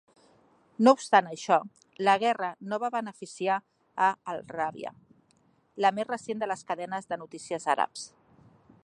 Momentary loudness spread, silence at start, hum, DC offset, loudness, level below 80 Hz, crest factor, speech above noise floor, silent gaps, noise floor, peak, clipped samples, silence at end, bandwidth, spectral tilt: 18 LU; 0.8 s; none; under 0.1%; -28 LUFS; -78 dBFS; 24 dB; 39 dB; none; -67 dBFS; -6 dBFS; under 0.1%; 0.75 s; 11 kHz; -4 dB/octave